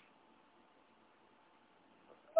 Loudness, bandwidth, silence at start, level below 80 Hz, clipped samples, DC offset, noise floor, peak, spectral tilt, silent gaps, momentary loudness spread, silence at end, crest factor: -67 LUFS; 4 kHz; 2.35 s; under -90 dBFS; under 0.1%; under 0.1%; -68 dBFS; -20 dBFS; -3 dB/octave; none; 3 LU; 0 s; 26 dB